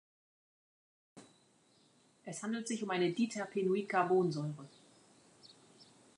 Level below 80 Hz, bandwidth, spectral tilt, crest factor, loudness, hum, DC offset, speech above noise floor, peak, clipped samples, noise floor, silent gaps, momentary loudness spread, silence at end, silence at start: -88 dBFS; 11 kHz; -5.5 dB/octave; 20 dB; -35 LUFS; none; under 0.1%; 35 dB; -20 dBFS; under 0.1%; -69 dBFS; none; 17 LU; 0.35 s; 1.15 s